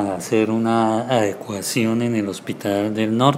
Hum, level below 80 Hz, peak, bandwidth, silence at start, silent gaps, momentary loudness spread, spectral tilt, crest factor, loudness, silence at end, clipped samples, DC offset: none; -64 dBFS; -2 dBFS; 16 kHz; 0 s; none; 6 LU; -5.5 dB/octave; 18 dB; -20 LUFS; 0 s; under 0.1%; under 0.1%